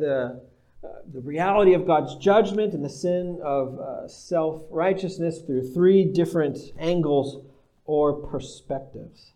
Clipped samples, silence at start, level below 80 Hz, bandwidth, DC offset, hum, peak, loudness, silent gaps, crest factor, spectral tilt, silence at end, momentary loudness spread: under 0.1%; 0 s; -52 dBFS; 10.5 kHz; under 0.1%; none; -6 dBFS; -24 LUFS; none; 18 dB; -7 dB/octave; 0.25 s; 19 LU